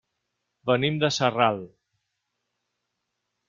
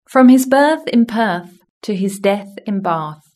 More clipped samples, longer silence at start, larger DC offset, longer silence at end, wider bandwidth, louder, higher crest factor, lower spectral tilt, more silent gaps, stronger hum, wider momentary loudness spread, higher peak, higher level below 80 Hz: neither; first, 0.65 s vs 0.1 s; neither; first, 1.8 s vs 0.2 s; second, 7.6 kHz vs 13.5 kHz; second, -24 LUFS vs -15 LUFS; first, 22 dB vs 14 dB; about the same, -5 dB/octave vs -5.5 dB/octave; second, none vs 1.70-1.81 s; neither; second, 11 LU vs 14 LU; second, -6 dBFS vs 0 dBFS; about the same, -66 dBFS vs -64 dBFS